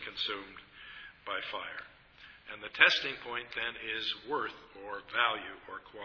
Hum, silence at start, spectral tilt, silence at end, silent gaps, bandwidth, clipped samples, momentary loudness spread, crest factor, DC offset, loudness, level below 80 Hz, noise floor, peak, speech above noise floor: none; 0 s; -2 dB/octave; 0 s; none; 5.4 kHz; under 0.1%; 23 LU; 30 dB; under 0.1%; -32 LUFS; -68 dBFS; -57 dBFS; -6 dBFS; 22 dB